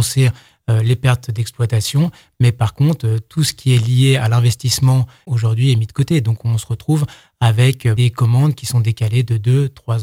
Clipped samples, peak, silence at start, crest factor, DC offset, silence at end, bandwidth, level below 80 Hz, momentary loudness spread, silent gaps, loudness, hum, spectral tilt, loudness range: under 0.1%; 0 dBFS; 0 s; 14 dB; under 0.1%; 0 s; 16 kHz; -46 dBFS; 6 LU; none; -16 LUFS; none; -6 dB/octave; 2 LU